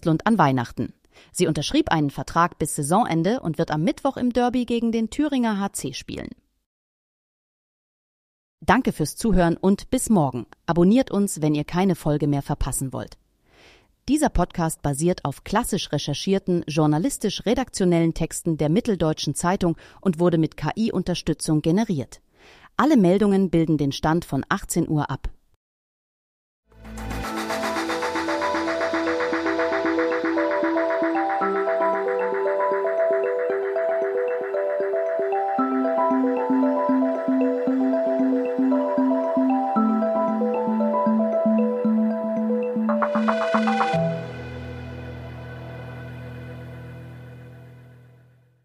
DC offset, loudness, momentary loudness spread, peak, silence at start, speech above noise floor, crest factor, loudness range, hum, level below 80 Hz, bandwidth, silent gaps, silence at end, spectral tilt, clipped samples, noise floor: under 0.1%; -22 LUFS; 13 LU; -4 dBFS; 0 s; 33 dB; 18 dB; 7 LU; none; -42 dBFS; 15.5 kHz; 6.66-8.58 s, 25.56-26.63 s; 0.8 s; -6 dB/octave; under 0.1%; -55 dBFS